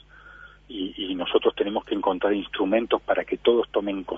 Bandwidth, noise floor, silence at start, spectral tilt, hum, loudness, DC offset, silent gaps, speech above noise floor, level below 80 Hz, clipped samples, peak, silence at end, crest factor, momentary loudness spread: 3.8 kHz; -48 dBFS; 0.25 s; -7 dB/octave; 50 Hz at -55 dBFS; -25 LUFS; under 0.1%; none; 24 dB; -54 dBFS; under 0.1%; -6 dBFS; 0 s; 20 dB; 8 LU